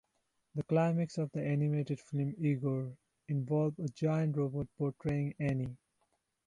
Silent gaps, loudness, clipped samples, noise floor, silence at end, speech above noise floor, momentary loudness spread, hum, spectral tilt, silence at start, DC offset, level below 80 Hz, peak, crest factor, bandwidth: none; -35 LUFS; under 0.1%; -80 dBFS; 0.7 s; 46 dB; 7 LU; none; -9 dB/octave; 0.55 s; under 0.1%; -64 dBFS; -20 dBFS; 16 dB; 9.6 kHz